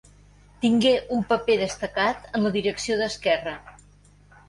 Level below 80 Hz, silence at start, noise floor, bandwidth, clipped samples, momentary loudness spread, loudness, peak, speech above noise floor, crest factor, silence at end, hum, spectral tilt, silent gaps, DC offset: -52 dBFS; 0.6 s; -54 dBFS; 11.5 kHz; under 0.1%; 6 LU; -24 LUFS; -8 dBFS; 30 dB; 18 dB; 0.8 s; 50 Hz at -45 dBFS; -4.5 dB/octave; none; under 0.1%